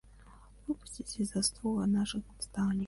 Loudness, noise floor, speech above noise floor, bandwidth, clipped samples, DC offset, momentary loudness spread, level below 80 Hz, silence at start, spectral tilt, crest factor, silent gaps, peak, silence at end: -34 LUFS; -56 dBFS; 22 dB; 11.5 kHz; under 0.1%; under 0.1%; 10 LU; -54 dBFS; 0.15 s; -4.5 dB/octave; 18 dB; none; -16 dBFS; 0 s